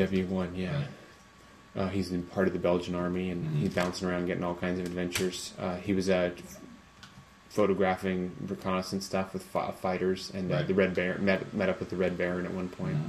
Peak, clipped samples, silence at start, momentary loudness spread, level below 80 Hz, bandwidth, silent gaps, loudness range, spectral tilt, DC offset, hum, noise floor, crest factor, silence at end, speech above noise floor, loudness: -10 dBFS; under 0.1%; 0 s; 9 LU; -54 dBFS; 14 kHz; none; 2 LU; -6 dB/octave; under 0.1%; none; -55 dBFS; 20 dB; 0 s; 24 dB; -31 LUFS